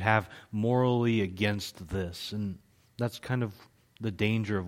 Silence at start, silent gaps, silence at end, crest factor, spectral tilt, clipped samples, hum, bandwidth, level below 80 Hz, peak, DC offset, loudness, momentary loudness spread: 0 s; none; 0 s; 22 dB; -6.5 dB/octave; under 0.1%; none; 16 kHz; -58 dBFS; -8 dBFS; under 0.1%; -31 LUFS; 12 LU